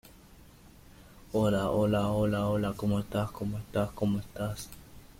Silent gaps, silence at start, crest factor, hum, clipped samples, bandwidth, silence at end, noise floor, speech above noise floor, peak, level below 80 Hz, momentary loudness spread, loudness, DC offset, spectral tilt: none; 0.35 s; 16 dB; none; under 0.1%; 16.5 kHz; 0.15 s; -54 dBFS; 25 dB; -16 dBFS; -52 dBFS; 9 LU; -31 LUFS; under 0.1%; -7 dB/octave